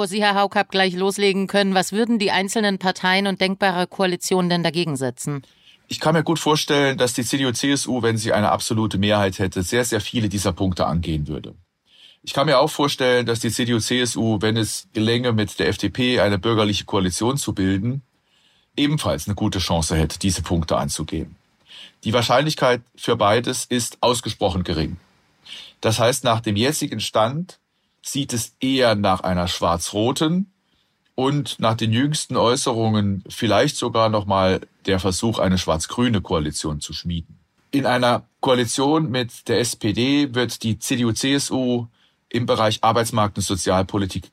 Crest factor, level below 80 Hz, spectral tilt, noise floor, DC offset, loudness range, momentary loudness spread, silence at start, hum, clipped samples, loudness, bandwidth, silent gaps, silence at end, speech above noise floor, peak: 18 dB; -44 dBFS; -4.5 dB/octave; -66 dBFS; under 0.1%; 3 LU; 7 LU; 0 s; none; under 0.1%; -20 LUFS; 16 kHz; none; 0.05 s; 45 dB; -4 dBFS